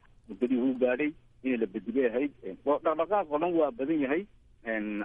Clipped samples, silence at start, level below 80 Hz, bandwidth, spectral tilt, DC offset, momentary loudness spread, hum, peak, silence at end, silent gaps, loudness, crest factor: under 0.1%; 0.3 s; -62 dBFS; 3.8 kHz; -9 dB/octave; under 0.1%; 8 LU; none; -14 dBFS; 0 s; none; -30 LUFS; 16 dB